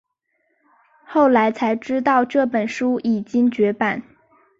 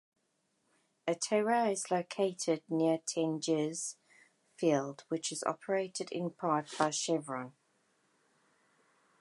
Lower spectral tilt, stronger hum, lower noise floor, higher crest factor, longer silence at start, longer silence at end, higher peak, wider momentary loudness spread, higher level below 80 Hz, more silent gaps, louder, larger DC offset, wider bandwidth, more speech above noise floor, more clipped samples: first, -6.5 dB/octave vs -4 dB/octave; neither; second, -70 dBFS vs -78 dBFS; second, 14 dB vs 22 dB; about the same, 1.1 s vs 1.05 s; second, 0.55 s vs 1.7 s; first, -6 dBFS vs -12 dBFS; about the same, 7 LU vs 8 LU; first, -64 dBFS vs -88 dBFS; neither; first, -19 LUFS vs -34 LUFS; neither; second, 7.6 kHz vs 11.5 kHz; first, 51 dB vs 45 dB; neither